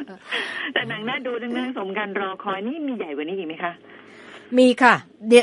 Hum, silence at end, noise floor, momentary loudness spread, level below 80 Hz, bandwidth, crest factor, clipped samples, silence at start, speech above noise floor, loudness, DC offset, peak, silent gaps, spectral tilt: none; 0 s; -44 dBFS; 13 LU; -76 dBFS; 11.5 kHz; 22 dB; under 0.1%; 0 s; 22 dB; -23 LUFS; under 0.1%; 0 dBFS; none; -4 dB/octave